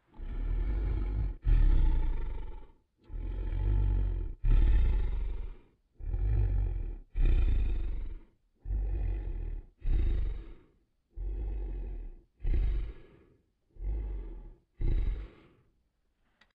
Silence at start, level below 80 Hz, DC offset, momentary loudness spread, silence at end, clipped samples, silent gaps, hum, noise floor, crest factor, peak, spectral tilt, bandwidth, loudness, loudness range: 0.15 s; -30 dBFS; under 0.1%; 17 LU; 1.25 s; under 0.1%; none; none; -74 dBFS; 16 dB; -16 dBFS; -10 dB/octave; 4 kHz; -35 LUFS; 7 LU